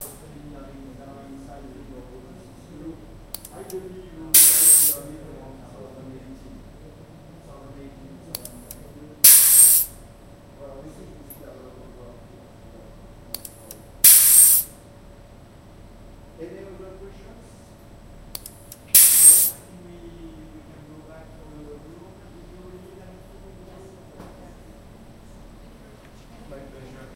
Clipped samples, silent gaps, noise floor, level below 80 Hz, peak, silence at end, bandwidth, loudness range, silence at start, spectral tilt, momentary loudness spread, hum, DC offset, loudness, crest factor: under 0.1%; none; -46 dBFS; -48 dBFS; 0 dBFS; 6.9 s; 16.5 kHz; 5 LU; 0 s; 0 dB/octave; 30 LU; none; under 0.1%; -11 LUFS; 24 dB